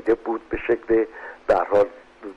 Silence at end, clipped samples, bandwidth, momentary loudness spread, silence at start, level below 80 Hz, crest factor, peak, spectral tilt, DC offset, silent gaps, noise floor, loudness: 0 s; under 0.1%; 8 kHz; 11 LU; 0.05 s; -46 dBFS; 14 dB; -8 dBFS; -7 dB/octave; under 0.1%; none; -40 dBFS; -23 LUFS